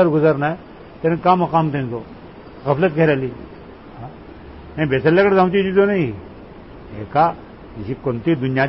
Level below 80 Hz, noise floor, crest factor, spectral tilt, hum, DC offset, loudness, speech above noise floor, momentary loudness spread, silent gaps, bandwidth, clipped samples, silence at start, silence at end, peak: -46 dBFS; -38 dBFS; 16 dB; -12 dB/octave; none; 0.1%; -18 LUFS; 21 dB; 24 LU; none; 5.8 kHz; under 0.1%; 0 s; 0 s; -2 dBFS